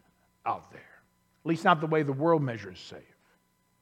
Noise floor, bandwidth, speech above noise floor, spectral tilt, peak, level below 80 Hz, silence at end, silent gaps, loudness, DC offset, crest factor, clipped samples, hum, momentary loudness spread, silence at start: -70 dBFS; 12 kHz; 41 dB; -7 dB/octave; -6 dBFS; -76 dBFS; 0.8 s; none; -28 LUFS; under 0.1%; 24 dB; under 0.1%; none; 20 LU; 0.45 s